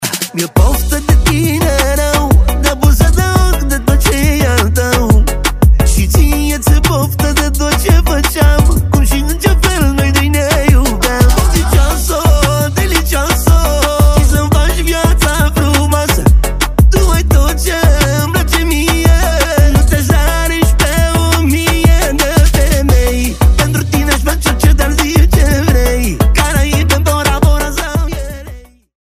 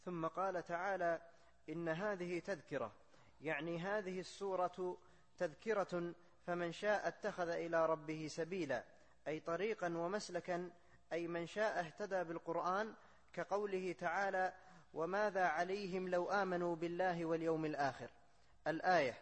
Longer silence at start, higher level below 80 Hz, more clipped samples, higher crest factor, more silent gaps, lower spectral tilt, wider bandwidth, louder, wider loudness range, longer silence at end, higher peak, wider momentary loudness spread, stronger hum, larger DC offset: about the same, 0 s vs 0.05 s; first, -12 dBFS vs -76 dBFS; neither; second, 10 dB vs 18 dB; neither; about the same, -5 dB/octave vs -5.5 dB/octave; first, 16 kHz vs 8.4 kHz; first, -11 LUFS vs -41 LUFS; second, 1 LU vs 4 LU; first, 0.45 s vs 0 s; first, 0 dBFS vs -24 dBFS; second, 3 LU vs 9 LU; neither; neither